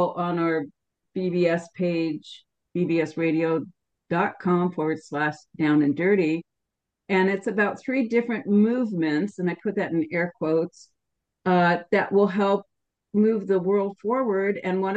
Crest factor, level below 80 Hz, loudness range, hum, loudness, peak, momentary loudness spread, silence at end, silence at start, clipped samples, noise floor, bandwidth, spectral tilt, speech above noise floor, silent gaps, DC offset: 16 dB; -72 dBFS; 3 LU; none; -24 LUFS; -8 dBFS; 8 LU; 0 s; 0 s; under 0.1%; -83 dBFS; 8.6 kHz; -8 dB/octave; 60 dB; none; under 0.1%